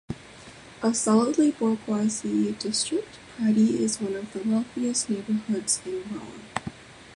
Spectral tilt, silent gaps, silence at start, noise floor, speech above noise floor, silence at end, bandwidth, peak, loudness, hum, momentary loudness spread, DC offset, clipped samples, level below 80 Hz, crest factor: -4 dB/octave; none; 0.1 s; -46 dBFS; 21 dB; 0 s; 11.5 kHz; -6 dBFS; -26 LUFS; none; 17 LU; under 0.1%; under 0.1%; -60 dBFS; 20 dB